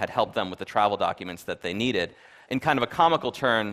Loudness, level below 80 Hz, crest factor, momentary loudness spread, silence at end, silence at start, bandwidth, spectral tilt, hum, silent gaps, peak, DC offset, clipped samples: -26 LUFS; -60 dBFS; 20 dB; 11 LU; 0 s; 0 s; 15.5 kHz; -5 dB/octave; none; none; -6 dBFS; under 0.1%; under 0.1%